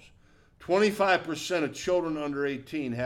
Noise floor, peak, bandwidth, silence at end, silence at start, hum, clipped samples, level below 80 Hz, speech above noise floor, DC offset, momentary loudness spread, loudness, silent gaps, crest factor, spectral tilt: -59 dBFS; -12 dBFS; 17.5 kHz; 0 s; 0.6 s; none; under 0.1%; -62 dBFS; 31 dB; under 0.1%; 9 LU; -28 LUFS; none; 16 dB; -4.5 dB/octave